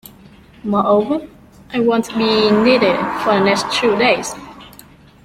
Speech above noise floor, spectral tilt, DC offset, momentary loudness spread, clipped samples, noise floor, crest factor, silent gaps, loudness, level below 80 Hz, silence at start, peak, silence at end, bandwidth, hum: 28 dB; -4.5 dB/octave; under 0.1%; 13 LU; under 0.1%; -43 dBFS; 16 dB; none; -15 LUFS; -50 dBFS; 0.65 s; 0 dBFS; 0.55 s; 15.5 kHz; none